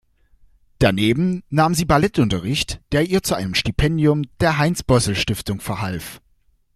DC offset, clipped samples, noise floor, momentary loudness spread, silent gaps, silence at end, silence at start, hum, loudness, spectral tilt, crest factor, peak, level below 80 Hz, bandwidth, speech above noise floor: under 0.1%; under 0.1%; -60 dBFS; 8 LU; none; 0.6 s; 0.8 s; none; -19 LUFS; -5 dB/octave; 18 dB; -2 dBFS; -36 dBFS; 15 kHz; 41 dB